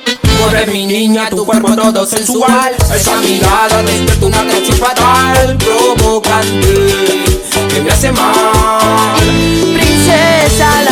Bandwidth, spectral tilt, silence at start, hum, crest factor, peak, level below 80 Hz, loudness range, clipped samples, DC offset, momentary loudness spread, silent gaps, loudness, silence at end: 19 kHz; -4 dB/octave; 0 s; none; 8 dB; 0 dBFS; -20 dBFS; 1 LU; under 0.1%; under 0.1%; 4 LU; none; -9 LUFS; 0 s